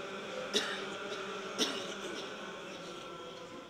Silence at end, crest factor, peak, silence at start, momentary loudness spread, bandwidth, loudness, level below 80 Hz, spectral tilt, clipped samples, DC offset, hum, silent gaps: 0 s; 24 dB; -16 dBFS; 0 s; 11 LU; 16 kHz; -38 LUFS; -74 dBFS; -2 dB/octave; under 0.1%; under 0.1%; none; none